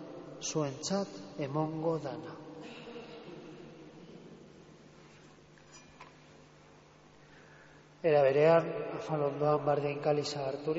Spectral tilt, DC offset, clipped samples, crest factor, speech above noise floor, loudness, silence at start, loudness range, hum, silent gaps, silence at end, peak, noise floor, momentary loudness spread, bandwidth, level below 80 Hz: -5 dB/octave; under 0.1%; under 0.1%; 20 dB; 28 dB; -32 LUFS; 0 s; 23 LU; none; none; 0 s; -14 dBFS; -58 dBFS; 26 LU; 7.6 kHz; -72 dBFS